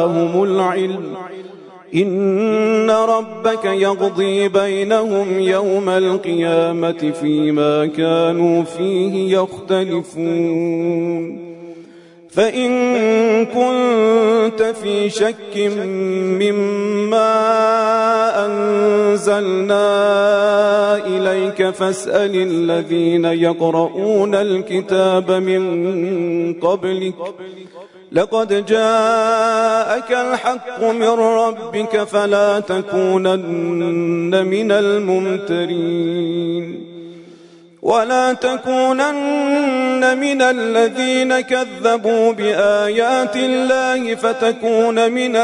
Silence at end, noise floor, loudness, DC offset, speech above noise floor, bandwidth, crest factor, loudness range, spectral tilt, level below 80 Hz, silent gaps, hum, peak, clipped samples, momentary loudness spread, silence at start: 0 s; -43 dBFS; -16 LUFS; under 0.1%; 28 dB; 11 kHz; 14 dB; 4 LU; -5.5 dB/octave; -66 dBFS; none; none; -2 dBFS; under 0.1%; 6 LU; 0 s